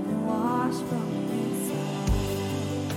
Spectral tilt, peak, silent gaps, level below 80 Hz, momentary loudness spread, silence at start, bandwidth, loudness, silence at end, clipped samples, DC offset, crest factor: -6 dB/octave; -14 dBFS; none; -38 dBFS; 3 LU; 0 s; 16.5 kHz; -28 LUFS; 0 s; under 0.1%; under 0.1%; 14 dB